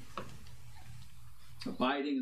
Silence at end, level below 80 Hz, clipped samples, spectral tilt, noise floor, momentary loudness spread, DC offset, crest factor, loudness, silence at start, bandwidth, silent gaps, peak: 0 s; -62 dBFS; under 0.1%; -5.5 dB/octave; -57 dBFS; 24 LU; 0.6%; 22 dB; -37 LUFS; 0 s; 15 kHz; none; -18 dBFS